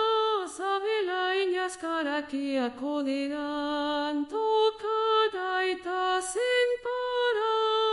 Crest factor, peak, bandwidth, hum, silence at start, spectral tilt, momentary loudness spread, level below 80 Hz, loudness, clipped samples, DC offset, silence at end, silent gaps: 14 dB; -14 dBFS; 11.5 kHz; none; 0 s; -1.5 dB/octave; 6 LU; -64 dBFS; -28 LUFS; under 0.1%; under 0.1%; 0 s; none